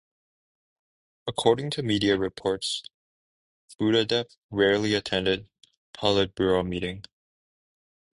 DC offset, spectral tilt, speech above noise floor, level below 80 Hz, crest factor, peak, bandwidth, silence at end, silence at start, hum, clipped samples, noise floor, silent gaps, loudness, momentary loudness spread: under 0.1%; -5 dB/octave; over 65 dB; -54 dBFS; 22 dB; -6 dBFS; 11.5 kHz; 1.15 s; 1.25 s; none; under 0.1%; under -90 dBFS; 2.94-3.68 s, 4.37-4.49 s, 5.77-5.93 s; -26 LUFS; 10 LU